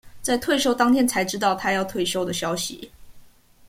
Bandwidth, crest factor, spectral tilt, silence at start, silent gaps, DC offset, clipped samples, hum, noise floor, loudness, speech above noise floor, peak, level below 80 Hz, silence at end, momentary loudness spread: 16.5 kHz; 18 dB; -3.5 dB/octave; 0.05 s; none; under 0.1%; under 0.1%; none; -49 dBFS; -22 LUFS; 27 dB; -6 dBFS; -52 dBFS; 0.45 s; 8 LU